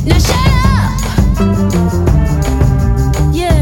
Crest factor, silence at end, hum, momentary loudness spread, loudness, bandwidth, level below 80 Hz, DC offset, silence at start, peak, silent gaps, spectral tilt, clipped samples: 10 dB; 0 s; none; 3 LU; -12 LUFS; 17 kHz; -14 dBFS; under 0.1%; 0 s; 0 dBFS; none; -6 dB/octave; 0.1%